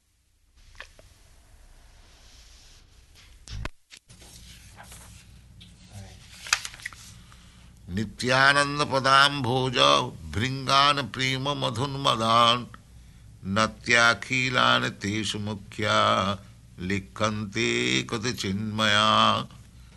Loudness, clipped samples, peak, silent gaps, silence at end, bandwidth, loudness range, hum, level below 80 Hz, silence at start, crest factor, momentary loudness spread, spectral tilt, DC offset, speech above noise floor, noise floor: -23 LUFS; under 0.1%; -4 dBFS; none; 0.2 s; 12 kHz; 15 LU; none; -50 dBFS; 0.8 s; 24 dB; 19 LU; -3.5 dB/octave; under 0.1%; 41 dB; -65 dBFS